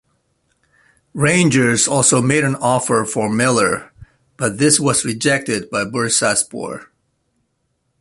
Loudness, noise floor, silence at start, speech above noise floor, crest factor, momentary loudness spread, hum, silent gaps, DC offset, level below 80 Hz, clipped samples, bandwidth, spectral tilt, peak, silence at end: -16 LUFS; -68 dBFS; 1.15 s; 52 dB; 18 dB; 10 LU; none; none; under 0.1%; -52 dBFS; under 0.1%; 12 kHz; -3.5 dB/octave; 0 dBFS; 1.15 s